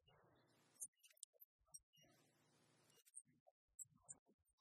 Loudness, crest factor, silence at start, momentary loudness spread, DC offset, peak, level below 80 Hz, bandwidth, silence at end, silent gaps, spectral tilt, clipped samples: -61 LUFS; 30 dB; 0 s; 8 LU; under 0.1%; -38 dBFS; under -90 dBFS; 14 kHz; 0.1 s; 0.88-0.93 s, 1.24-1.33 s, 1.45-1.59 s, 1.83-1.93 s, 3.40-3.68 s, 4.19-4.26 s, 4.34-4.39 s; -0.5 dB/octave; under 0.1%